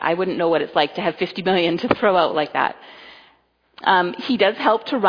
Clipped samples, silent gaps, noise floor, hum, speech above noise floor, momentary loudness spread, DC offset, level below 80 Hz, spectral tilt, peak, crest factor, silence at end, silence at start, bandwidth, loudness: under 0.1%; none; -59 dBFS; none; 40 dB; 6 LU; under 0.1%; -60 dBFS; -6.5 dB/octave; 0 dBFS; 20 dB; 0 s; 0 s; 5.2 kHz; -19 LUFS